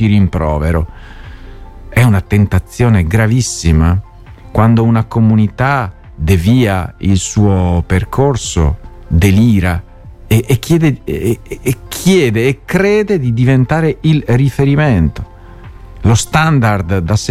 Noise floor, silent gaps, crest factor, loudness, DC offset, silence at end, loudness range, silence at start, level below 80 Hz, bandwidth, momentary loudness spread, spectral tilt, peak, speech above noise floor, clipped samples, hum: -32 dBFS; none; 12 dB; -12 LUFS; under 0.1%; 0 s; 2 LU; 0 s; -26 dBFS; 15 kHz; 7 LU; -6.5 dB/octave; 0 dBFS; 22 dB; under 0.1%; none